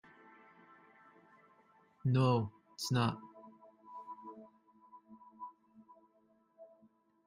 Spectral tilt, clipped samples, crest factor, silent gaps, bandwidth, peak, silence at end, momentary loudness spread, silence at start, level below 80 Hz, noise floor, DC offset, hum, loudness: -6.5 dB/octave; under 0.1%; 20 dB; none; 11 kHz; -20 dBFS; 0.6 s; 29 LU; 2.05 s; -74 dBFS; -72 dBFS; under 0.1%; none; -35 LUFS